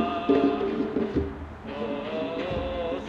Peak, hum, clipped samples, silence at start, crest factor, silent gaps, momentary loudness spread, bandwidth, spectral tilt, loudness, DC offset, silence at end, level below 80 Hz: -10 dBFS; none; under 0.1%; 0 s; 18 dB; none; 12 LU; 7.2 kHz; -8 dB/octave; -28 LUFS; under 0.1%; 0 s; -46 dBFS